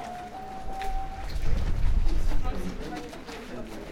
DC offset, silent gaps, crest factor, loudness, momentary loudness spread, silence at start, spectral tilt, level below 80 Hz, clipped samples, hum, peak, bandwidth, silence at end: under 0.1%; none; 14 dB; -34 LUFS; 9 LU; 0 s; -6 dB/octave; -28 dBFS; under 0.1%; none; -12 dBFS; 8.8 kHz; 0 s